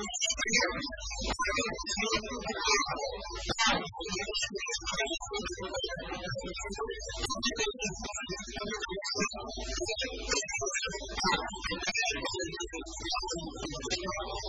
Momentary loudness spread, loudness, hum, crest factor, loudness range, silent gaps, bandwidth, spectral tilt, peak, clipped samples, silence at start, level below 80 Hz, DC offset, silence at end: 9 LU; -33 LUFS; none; 20 dB; 4 LU; none; 11 kHz; -2 dB/octave; -14 dBFS; under 0.1%; 0 s; -48 dBFS; under 0.1%; 0 s